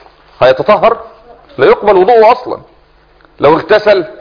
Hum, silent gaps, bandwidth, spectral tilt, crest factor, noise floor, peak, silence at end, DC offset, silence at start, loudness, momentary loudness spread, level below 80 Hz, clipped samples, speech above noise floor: none; none; 5.4 kHz; -7 dB/octave; 10 dB; -45 dBFS; 0 dBFS; 0.1 s; under 0.1%; 0.4 s; -9 LUFS; 14 LU; -42 dBFS; 1%; 37 dB